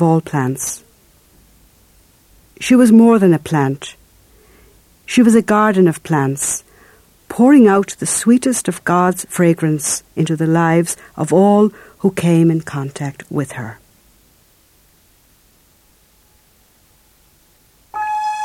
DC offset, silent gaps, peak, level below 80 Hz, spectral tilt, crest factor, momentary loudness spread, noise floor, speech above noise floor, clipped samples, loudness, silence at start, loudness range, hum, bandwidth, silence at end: under 0.1%; none; 0 dBFS; -54 dBFS; -6 dB/octave; 16 dB; 15 LU; -53 dBFS; 40 dB; under 0.1%; -14 LUFS; 0 s; 10 LU; none; 15.5 kHz; 0 s